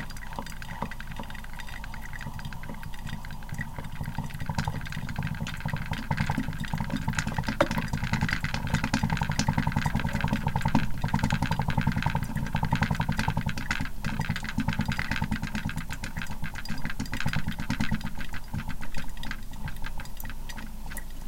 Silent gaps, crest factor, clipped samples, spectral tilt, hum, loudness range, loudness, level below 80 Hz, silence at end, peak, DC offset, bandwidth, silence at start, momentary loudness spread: none; 20 dB; under 0.1%; -5.5 dB/octave; none; 10 LU; -32 LUFS; -36 dBFS; 0 s; -8 dBFS; under 0.1%; 17 kHz; 0 s; 12 LU